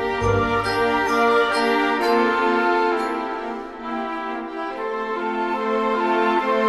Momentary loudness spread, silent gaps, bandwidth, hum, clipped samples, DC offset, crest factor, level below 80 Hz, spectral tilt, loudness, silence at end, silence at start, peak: 10 LU; none; 13.5 kHz; none; under 0.1%; under 0.1%; 14 dB; -46 dBFS; -5.5 dB/octave; -21 LUFS; 0 s; 0 s; -6 dBFS